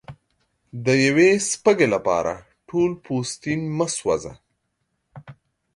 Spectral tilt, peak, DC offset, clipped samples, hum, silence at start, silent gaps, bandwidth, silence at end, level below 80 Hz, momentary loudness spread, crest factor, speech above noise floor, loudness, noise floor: -4.5 dB/octave; -4 dBFS; under 0.1%; under 0.1%; none; 0.1 s; none; 11.5 kHz; 0.45 s; -56 dBFS; 12 LU; 20 dB; 54 dB; -21 LUFS; -74 dBFS